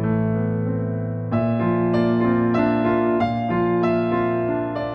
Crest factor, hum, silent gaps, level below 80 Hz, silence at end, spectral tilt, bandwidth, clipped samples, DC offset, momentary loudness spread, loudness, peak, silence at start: 14 dB; none; none; -48 dBFS; 0 s; -10 dB/octave; 5.8 kHz; under 0.1%; under 0.1%; 5 LU; -21 LUFS; -6 dBFS; 0 s